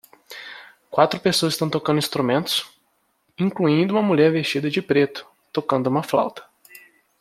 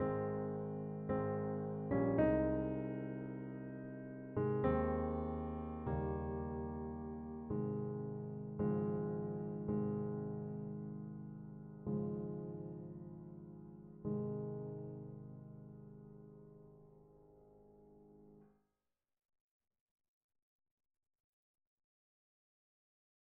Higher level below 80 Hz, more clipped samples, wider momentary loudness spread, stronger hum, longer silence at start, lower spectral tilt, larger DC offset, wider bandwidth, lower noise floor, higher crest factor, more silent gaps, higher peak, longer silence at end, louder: second, -66 dBFS vs -58 dBFS; neither; about the same, 19 LU vs 18 LU; neither; first, 0.3 s vs 0 s; second, -5 dB/octave vs -10 dB/octave; neither; first, 16 kHz vs 3.7 kHz; second, -67 dBFS vs -90 dBFS; about the same, 20 dB vs 20 dB; neither; first, -2 dBFS vs -22 dBFS; second, 0.45 s vs 4.9 s; first, -21 LUFS vs -42 LUFS